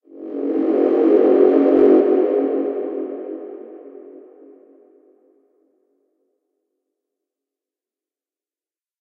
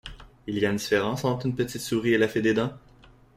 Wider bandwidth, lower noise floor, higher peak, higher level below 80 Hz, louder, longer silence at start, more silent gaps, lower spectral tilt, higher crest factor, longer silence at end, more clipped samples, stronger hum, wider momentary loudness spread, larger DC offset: second, 4.4 kHz vs 16 kHz; first, under -90 dBFS vs -54 dBFS; first, -2 dBFS vs -10 dBFS; second, -70 dBFS vs -54 dBFS; first, -16 LUFS vs -26 LUFS; about the same, 0.15 s vs 0.05 s; neither; first, -8.5 dB/octave vs -5.5 dB/octave; about the same, 18 dB vs 18 dB; first, 4.8 s vs 0.6 s; neither; neither; first, 21 LU vs 10 LU; neither